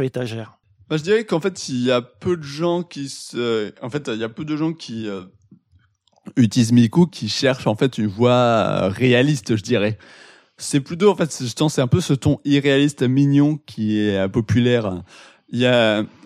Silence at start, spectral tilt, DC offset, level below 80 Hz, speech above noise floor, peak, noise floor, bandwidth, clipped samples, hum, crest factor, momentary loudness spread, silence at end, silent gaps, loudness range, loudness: 0 s; -6 dB/octave; under 0.1%; -56 dBFS; 40 dB; -4 dBFS; -59 dBFS; 14 kHz; under 0.1%; none; 16 dB; 12 LU; 0.2 s; none; 7 LU; -19 LUFS